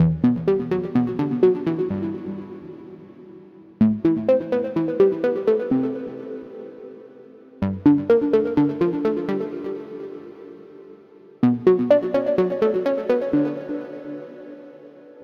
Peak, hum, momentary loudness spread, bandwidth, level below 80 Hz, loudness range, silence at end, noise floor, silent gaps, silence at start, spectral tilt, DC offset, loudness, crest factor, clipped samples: -4 dBFS; none; 20 LU; 6.2 kHz; -54 dBFS; 3 LU; 0 s; -47 dBFS; none; 0 s; -10 dB/octave; under 0.1%; -21 LUFS; 18 dB; under 0.1%